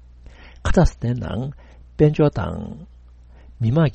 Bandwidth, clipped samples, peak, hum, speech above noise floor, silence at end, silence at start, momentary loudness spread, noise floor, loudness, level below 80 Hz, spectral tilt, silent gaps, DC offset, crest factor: 8.4 kHz; under 0.1%; -2 dBFS; none; 26 dB; 0 s; 0.45 s; 17 LU; -45 dBFS; -21 LUFS; -30 dBFS; -8 dB/octave; none; under 0.1%; 18 dB